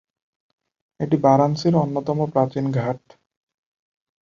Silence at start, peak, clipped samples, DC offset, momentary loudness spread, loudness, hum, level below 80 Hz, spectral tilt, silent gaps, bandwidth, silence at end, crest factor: 1 s; -2 dBFS; under 0.1%; under 0.1%; 11 LU; -20 LUFS; none; -60 dBFS; -8 dB/octave; none; 7.4 kHz; 1.25 s; 20 dB